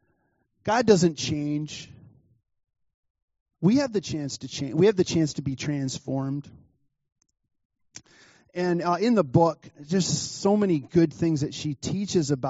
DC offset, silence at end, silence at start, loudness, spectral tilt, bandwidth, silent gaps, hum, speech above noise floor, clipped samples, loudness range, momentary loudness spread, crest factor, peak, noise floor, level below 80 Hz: under 0.1%; 0 s; 0.65 s; -25 LUFS; -6 dB/octave; 8 kHz; 2.94-3.03 s, 3.10-3.15 s, 3.22-3.28 s, 3.40-3.46 s, 7.65-7.70 s; none; 47 dB; under 0.1%; 7 LU; 11 LU; 22 dB; -4 dBFS; -71 dBFS; -60 dBFS